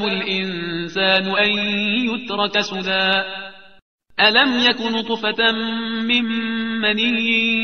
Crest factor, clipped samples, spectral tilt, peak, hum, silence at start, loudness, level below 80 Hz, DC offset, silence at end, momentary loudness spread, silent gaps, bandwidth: 18 dB; under 0.1%; -4.5 dB/octave; 0 dBFS; none; 0 s; -18 LUFS; -58 dBFS; 0.4%; 0 s; 8 LU; 3.82-3.99 s; 6.6 kHz